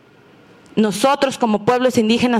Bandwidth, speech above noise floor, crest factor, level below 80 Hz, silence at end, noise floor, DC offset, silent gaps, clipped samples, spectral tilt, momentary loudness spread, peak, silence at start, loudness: 15 kHz; 32 dB; 14 dB; -56 dBFS; 0 s; -48 dBFS; under 0.1%; none; under 0.1%; -4.5 dB/octave; 4 LU; -4 dBFS; 0.75 s; -17 LUFS